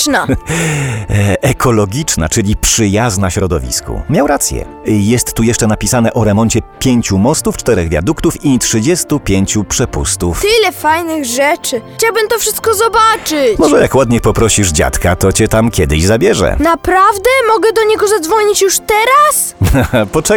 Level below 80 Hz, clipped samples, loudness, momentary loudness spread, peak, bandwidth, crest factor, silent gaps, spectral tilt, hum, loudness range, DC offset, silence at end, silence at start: -26 dBFS; under 0.1%; -11 LUFS; 5 LU; 0 dBFS; 19.5 kHz; 10 dB; none; -4.5 dB/octave; none; 3 LU; under 0.1%; 0 s; 0 s